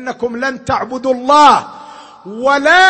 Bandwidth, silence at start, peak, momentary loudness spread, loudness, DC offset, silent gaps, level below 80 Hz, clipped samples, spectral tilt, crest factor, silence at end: 8.8 kHz; 0 s; 0 dBFS; 21 LU; -12 LUFS; under 0.1%; none; -48 dBFS; 0.1%; -3 dB/octave; 12 dB; 0 s